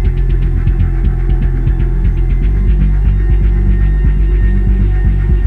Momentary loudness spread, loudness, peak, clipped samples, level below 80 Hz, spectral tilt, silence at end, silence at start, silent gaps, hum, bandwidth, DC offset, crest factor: 2 LU; -14 LUFS; -2 dBFS; under 0.1%; -10 dBFS; -10 dB/octave; 0 s; 0 s; none; none; 3.2 kHz; under 0.1%; 8 dB